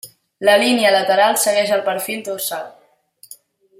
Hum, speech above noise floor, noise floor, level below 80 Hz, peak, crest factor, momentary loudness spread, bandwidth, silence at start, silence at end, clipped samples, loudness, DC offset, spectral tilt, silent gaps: none; 35 dB; -51 dBFS; -70 dBFS; -2 dBFS; 16 dB; 11 LU; 16.5 kHz; 0.05 s; 1.1 s; under 0.1%; -16 LUFS; under 0.1%; -2 dB/octave; none